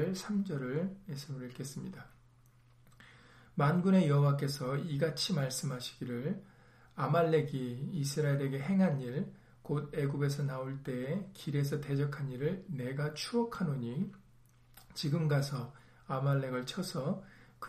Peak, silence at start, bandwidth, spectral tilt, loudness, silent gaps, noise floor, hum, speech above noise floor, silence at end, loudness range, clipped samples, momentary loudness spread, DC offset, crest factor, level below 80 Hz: -18 dBFS; 0 s; 15 kHz; -6.5 dB/octave; -35 LUFS; none; -63 dBFS; none; 30 dB; 0 s; 5 LU; under 0.1%; 13 LU; under 0.1%; 18 dB; -66 dBFS